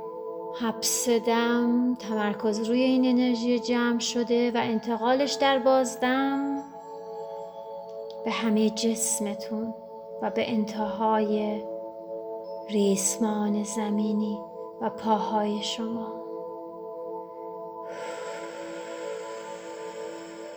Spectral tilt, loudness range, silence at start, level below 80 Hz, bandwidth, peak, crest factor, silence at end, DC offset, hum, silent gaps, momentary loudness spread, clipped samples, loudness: -4 dB/octave; 11 LU; 0 s; -70 dBFS; over 20 kHz; -10 dBFS; 18 dB; 0 s; under 0.1%; none; none; 15 LU; under 0.1%; -27 LUFS